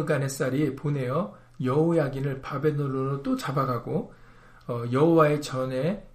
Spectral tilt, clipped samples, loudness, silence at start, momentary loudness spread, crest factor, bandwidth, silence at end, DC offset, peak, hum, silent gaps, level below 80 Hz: -7 dB/octave; under 0.1%; -26 LUFS; 0 s; 11 LU; 18 dB; 15.5 kHz; 0.05 s; under 0.1%; -8 dBFS; none; none; -54 dBFS